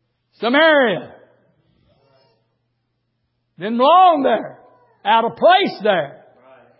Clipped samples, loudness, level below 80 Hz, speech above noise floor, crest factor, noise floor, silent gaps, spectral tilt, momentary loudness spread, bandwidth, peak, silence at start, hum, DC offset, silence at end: under 0.1%; -15 LUFS; -70 dBFS; 56 dB; 16 dB; -71 dBFS; none; -9 dB/octave; 15 LU; 5.8 kHz; -2 dBFS; 0.4 s; none; under 0.1%; 0.7 s